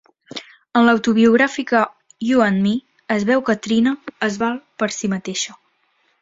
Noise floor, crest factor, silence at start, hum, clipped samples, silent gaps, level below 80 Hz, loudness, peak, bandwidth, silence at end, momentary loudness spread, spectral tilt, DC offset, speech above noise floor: -64 dBFS; 18 dB; 0.35 s; none; under 0.1%; none; -60 dBFS; -18 LUFS; -2 dBFS; 7.8 kHz; 0.7 s; 12 LU; -5 dB/octave; under 0.1%; 46 dB